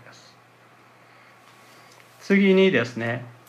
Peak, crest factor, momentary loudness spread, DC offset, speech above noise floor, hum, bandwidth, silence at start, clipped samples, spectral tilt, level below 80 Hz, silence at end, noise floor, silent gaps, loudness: -8 dBFS; 18 dB; 12 LU; under 0.1%; 34 dB; none; 8.6 kHz; 2.25 s; under 0.1%; -6.5 dB/octave; -74 dBFS; 0.2 s; -53 dBFS; none; -20 LUFS